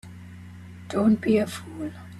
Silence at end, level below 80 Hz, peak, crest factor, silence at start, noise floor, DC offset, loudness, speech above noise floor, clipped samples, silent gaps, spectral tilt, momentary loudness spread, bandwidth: 0 s; -62 dBFS; -10 dBFS; 18 dB; 0.05 s; -42 dBFS; under 0.1%; -25 LUFS; 19 dB; under 0.1%; none; -6.5 dB/octave; 22 LU; 13 kHz